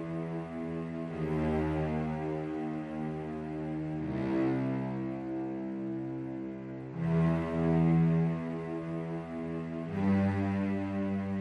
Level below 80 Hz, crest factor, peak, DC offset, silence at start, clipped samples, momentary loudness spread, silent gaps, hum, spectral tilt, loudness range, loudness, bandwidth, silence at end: -54 dBFS; 14 dB; -18 dBFS; under 0.1%; 0 s; under 0.1%; 9 LU; none; none; -9.5 dB/octave; 4 LU; -33 LUFS; 5.4 kHz; 0 s